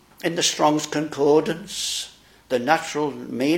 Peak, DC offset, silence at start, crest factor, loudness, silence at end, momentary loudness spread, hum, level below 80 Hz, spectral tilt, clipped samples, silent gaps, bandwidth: -2 dBFS; under 0.1%; 0.25 s; 20 dB; -22 LUFS; 0 s; 9 LU; none; -62 dBFS; -3.5 dB/octave; under 0.1%; none; 17 kHz